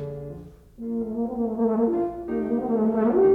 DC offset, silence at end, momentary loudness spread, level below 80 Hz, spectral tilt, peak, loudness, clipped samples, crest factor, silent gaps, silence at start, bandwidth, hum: under 0.1%; 0 s; 16 LU; -52 dBFS; -10.5 dB/octave; -10 dBFS; -25 LUFS; under 0.1%; 14 dB; none; 0 s; 3 kHz; none